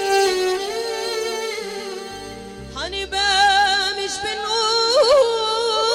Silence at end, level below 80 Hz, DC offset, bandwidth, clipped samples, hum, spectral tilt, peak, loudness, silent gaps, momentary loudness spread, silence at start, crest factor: 0 s; -48 dBFS; under 0.1%; 17 kHz; under 0.1%; none; -1.5 dB/octave; -6 dBFS; -19 LUFS; none; 16 LU; 0 s; 14 dB